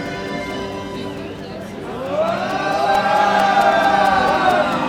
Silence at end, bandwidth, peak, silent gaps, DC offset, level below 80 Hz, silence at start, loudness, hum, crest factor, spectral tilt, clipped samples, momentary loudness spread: 0 s; 17 kHz; -4 dBFS; none; under 0.1%; -46 dBFS; 0 s; -17 LUFS; none; 14 dB; -4.5 dB/octave; under 0.1%; 15 LU